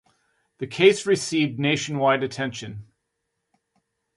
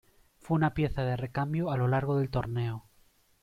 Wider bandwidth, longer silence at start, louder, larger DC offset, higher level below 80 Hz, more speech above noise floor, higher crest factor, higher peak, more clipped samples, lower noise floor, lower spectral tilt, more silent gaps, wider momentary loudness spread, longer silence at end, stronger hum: second, 11.5 kHz vs 13.5 kHz; first, 0.6 s vs 0.45 s; first, -22 LUFS vs -30 LUFS; neither; second, -64 dBFS vs -50 dBFS; first, 56 dB vs 36 dB; about the same, 20 dB vs 16 dB; first, -4 dBFS vs -16 dBFS; neither; first, -78 dBFS vs -65 dBFS; second, -4.5 dB/octave vs -9 dB/octave; neither; first, 18 LU vs 6 LU; first, 1.35 s vs 0.6 s; neither